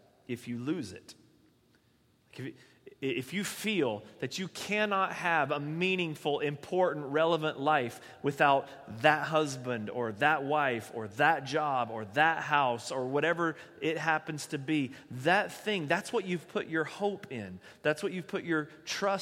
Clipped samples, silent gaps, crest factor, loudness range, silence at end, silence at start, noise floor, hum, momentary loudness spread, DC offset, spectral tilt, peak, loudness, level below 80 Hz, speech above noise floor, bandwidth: under 0.1%; none; 24 dB; 7 LU; 0 s; 0.3 s; -68 dBFS; none; 11 LU; under 0.1%; -4.5 dB/octave; -6 dBFS; -31 LUFS; -76 dBFS; 37 dB; 16 kHz